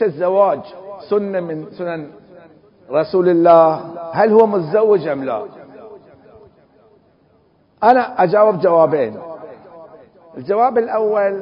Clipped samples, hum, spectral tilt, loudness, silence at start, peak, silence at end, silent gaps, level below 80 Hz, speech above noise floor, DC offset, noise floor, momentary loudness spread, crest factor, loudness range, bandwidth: under 0.1%; none; -9.5 dB/octave; -15 LUFS; 0 s; 0 dBFS; 0 s; none; -62 dBFS; 41 dB; under 0.1%; -55 dBFS; 20 LU; 16 dB; 6 LU; 5.4 kHz